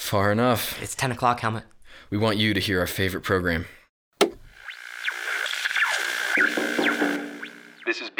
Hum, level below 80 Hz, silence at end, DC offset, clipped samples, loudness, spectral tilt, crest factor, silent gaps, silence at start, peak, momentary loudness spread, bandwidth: none; -52 dBFS; 0.1 s; under 0.1%; under 0.1%; -24 LUFS; -4 dB/octave; 22 dB; 3.89-4.12 s; 0 s; -4 dBFS; 15 LU; over 20 kHz